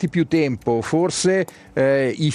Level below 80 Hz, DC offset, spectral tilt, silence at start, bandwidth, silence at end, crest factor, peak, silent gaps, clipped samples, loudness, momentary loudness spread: -54 dBFS; under 0.1%; -5.5 dB/octave; 0 s; 13 kHz; 0 s; 14 dB; -6 dBFS; none; under 0.1%; -20 LUFS; 4 LU